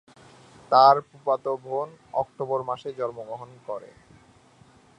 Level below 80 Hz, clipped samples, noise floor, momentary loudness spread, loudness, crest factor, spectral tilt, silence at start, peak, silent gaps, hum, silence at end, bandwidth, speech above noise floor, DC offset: -70 dBFS; under 0.1%; -56 dBFS; 20 LU; -24 LUFS; 24 dB; -6 dB/octave; 0.7 s; -4 dBFS; none; none; 1.15 s; 10 kHz; 31 dB; under 0.1%